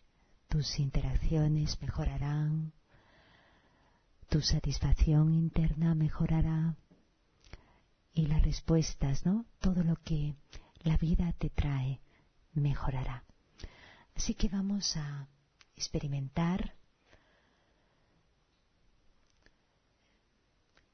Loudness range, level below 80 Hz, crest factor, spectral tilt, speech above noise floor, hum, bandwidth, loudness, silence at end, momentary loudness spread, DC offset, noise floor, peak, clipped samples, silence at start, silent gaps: 8 LU; -38 dBFS; 20 dB; -6 dB/octave; 42 dB; none; 6.6 kHz; -33 LUFS; 4.25 s; 12 LU; under 0.1%; -73 dBFS; -14 dBFS; under 0.1%; 0.5 s; none